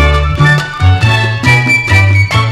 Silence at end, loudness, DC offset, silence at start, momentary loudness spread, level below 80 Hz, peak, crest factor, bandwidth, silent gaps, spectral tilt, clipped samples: 0 s; -9 LUFS; under 0.1%; 0 s; 3 LU; -20 dBFS; 0 dBFS; 8 dB; 13 kHz; none; -5.5 dB/octave; 0.4%